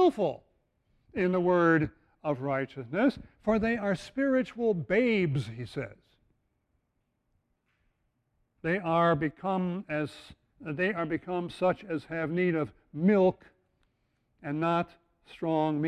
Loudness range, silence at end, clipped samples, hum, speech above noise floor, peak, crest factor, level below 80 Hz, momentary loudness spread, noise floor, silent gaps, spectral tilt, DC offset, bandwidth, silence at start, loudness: 5 LU; 0 s; under 0.1%; none; 49 dB; -14 dBFS; 18 dB; -60 dBFS; 13 LU; -78 dBFS; none; -8 dB/octave; under 0.1%; 10.5 kHz; 0 s; -29 LUFS